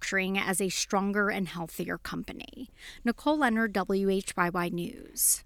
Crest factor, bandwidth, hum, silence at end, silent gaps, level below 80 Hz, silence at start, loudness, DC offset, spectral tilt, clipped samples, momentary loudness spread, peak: 20 dB; 19.5 kHz; none; 0 s; none; -56 dBFS; 0 s; -29 LUFS; under 0.1%; -3.5 dB/octave; under 0.1%; 12 LU; -10 dBFS